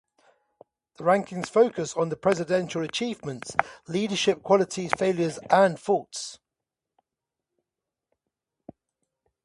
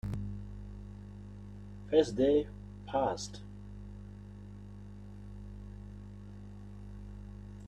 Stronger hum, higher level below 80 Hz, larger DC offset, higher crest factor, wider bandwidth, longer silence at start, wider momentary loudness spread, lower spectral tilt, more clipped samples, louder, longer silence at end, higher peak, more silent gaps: second, none vs 50 Hz at -50 dBFS; second, -68 dBFS vs -50 dBFS; neither; about the same, 26 dB vs 24 dB; first, 11.5 kHz vs 10 kHz; first, 1 s vs 0.05 s; second, 9 LU vs 20 LU; second, -4.5 dB/octave vs -6.5 dB/octave; neither; first, -25 LUFS vs -33 LUFS; first, 3.1 s vs 0 s; first, 0 dBFS vs -14 dBFS; neither